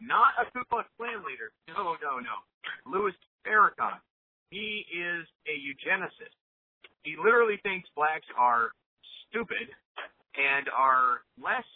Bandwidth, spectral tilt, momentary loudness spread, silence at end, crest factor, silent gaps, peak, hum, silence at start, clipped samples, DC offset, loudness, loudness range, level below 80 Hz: 4.3 kHz; -7 dB/octave; 18 LU; 0.15 s; 20 dB; 2.54-2.61 s, 3.27-3.39 s, 4.10-4.46 s, 5.35-5.39 s, 6.41-6.81 s, 8.86-8.97 s, 9.85-9.95 s; -10 dBFS; none; 0 s; under 0.1%; under 0.1%; -29 LUFS; 5 LU; -72 dBFS